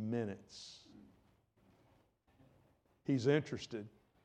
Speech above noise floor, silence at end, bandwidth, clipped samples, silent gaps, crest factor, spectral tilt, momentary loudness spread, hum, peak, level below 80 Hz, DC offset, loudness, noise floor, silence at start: 35 dB; 0.35 s; 9.6 kHz; under 0.1%; none; 22 dB; -6.5 dB/octave; 21 LU; none; -20 dBFS; -78 dBFS; under 0.1%; -38 LUFS; -72 dBFS; 0 s